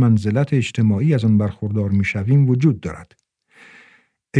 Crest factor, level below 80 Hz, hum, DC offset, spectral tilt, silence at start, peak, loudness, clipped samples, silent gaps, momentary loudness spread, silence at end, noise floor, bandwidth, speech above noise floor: 16 dB; -52 dBFS; none; under 0.1%; -8 dB/octave; 0 s; -2 dBFS; -18 LUFS; under 0.1%; none; 7 LU; 0 s; -55 dBFS; 9.8 kHz; 38 dB